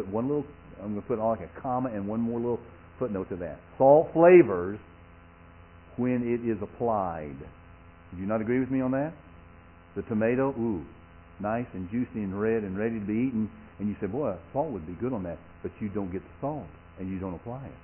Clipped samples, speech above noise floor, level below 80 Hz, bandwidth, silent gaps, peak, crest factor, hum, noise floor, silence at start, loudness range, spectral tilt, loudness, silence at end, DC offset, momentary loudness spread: under 0.1%; 24 dB; -54 dBFS; 3.2 kHz; none; -6 dBFS; 22 dB; none; -52 dBFS; 0 s; 10 LU; -8.5 dB/octave; -28 LUFS; 0.05 s; under 0.1%; 16 LU